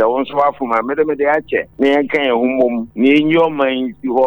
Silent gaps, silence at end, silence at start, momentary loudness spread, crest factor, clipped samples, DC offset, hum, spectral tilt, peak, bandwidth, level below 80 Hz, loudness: none; 0 s; 0 s; 5 LU; 12 dB; under 0.1%; under 0.1%; none; -7 dB/octave; -2 dBFS; over 20 kHz; -52 dBFS; -15 LUFS